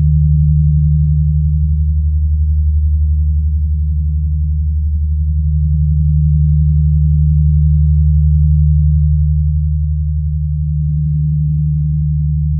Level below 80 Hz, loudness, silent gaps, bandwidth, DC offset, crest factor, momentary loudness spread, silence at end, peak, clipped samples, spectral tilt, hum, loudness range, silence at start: -14 dBFS; -14 LUFS; none; 0.3 kHz; under 0.1%; 8 dB; 5 LU; 0 s; -2 dBFS; under 0.1%; -30.5 dB/octave; none; 3 LU; 0 s